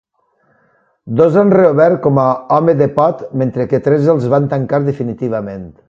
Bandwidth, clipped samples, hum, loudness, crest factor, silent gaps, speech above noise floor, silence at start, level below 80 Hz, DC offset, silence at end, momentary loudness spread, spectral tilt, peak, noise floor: 7.4 kHz; under 0.1%; none; -13 LUFS; 14 dB; none; 46 dB; 1.05 s; -50 dBFS; under 0.1%; 0.2 s; 10 LU; -10 dB/octave; 0 dBFS; -59 dBFS